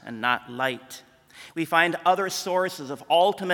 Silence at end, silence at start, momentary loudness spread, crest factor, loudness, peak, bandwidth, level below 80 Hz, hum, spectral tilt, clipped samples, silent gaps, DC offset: 0 s; 0.05 s; 16 LU; 22 dB; -24 LUFS; -4 dBFS; 18 kHz; -72 dBFS; none; -3.5 dB/octave; under 0.1%; none; under 0.1%